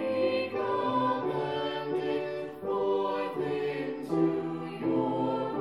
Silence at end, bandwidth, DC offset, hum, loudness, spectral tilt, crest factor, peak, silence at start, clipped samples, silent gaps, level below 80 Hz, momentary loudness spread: 0 s; 12 kHz; under 0.1%; none; -31 LUFS; -7.5 dB/octave; 14 dB; -16 dBFS; 0 s; under 0.1%; none; -70 dBFS; 5 LU